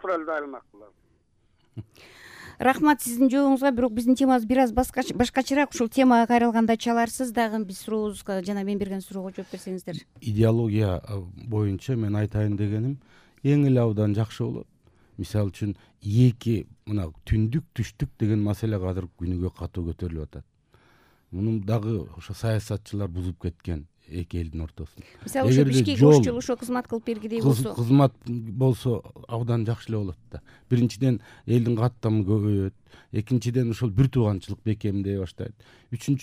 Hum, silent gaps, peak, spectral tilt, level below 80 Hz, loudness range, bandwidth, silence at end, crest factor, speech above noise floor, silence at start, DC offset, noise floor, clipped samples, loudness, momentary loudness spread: none; none; -4 dBFS; -7 dB/octave; -46 dBFS; 8 LU; 15.5 kHz; 0 s; 20 dB; 40 dB; 0.05 s; under 0.1%; -65 dBFS; under 0.1%; -25 LUFS; 15 LU